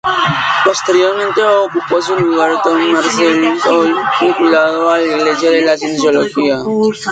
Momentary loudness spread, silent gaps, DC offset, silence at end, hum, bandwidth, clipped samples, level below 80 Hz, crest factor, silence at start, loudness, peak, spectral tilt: 3 LU; none; under 0.1%; 0 s; none; 9.2 kHz; under 0.1%; -54 dBFS; 12 dB; 0.05 s; -12 LUFS; 0 dBFS; -4 dB/octave